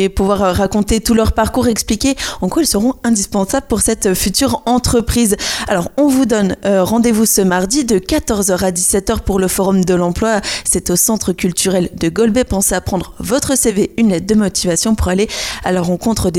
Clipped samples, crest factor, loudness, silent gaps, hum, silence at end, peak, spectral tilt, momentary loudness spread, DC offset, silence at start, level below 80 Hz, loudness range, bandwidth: under 0.1%; 14 dB; -14 LUFS; none; none; 0 s; 0 dBFS; -4 dB/octave; 4 LU; under 0.1%; 0 s; -30 dBFS; 1 LU; 17 kHz